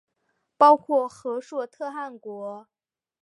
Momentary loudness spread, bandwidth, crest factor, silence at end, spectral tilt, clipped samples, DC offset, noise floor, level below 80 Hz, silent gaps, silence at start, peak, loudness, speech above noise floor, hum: 19 LU; 11.5 kHz; 22 dB; 0.65 s; -5 dB/octave; under 0.1%; under 0.1%; -75 dBFS; -80 dBFS; none; 0.6 s; -4 dBFS; -23 LUFS; 52 dB; none